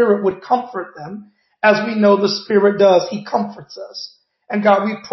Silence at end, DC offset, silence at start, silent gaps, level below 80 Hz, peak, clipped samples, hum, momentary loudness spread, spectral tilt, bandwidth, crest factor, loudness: 0.05 s; under 0.1%; 0 s; none; -64 dBFS; -2 dBFS; under 0.1%; none; 19 LU; -6 dB/octave; 6.2 kHz; 16 dB; -16 LUFS